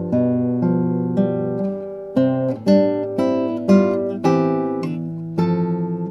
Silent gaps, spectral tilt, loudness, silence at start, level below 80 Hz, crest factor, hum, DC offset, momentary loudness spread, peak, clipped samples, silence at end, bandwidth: none; -9 dB/octave; -20 LUFS; 0 s; -60 dBFS; 16 dB; none; under 0.1%; 8 LU; -2 dBFS; under 0.1%; 0 s; 7.4 kHz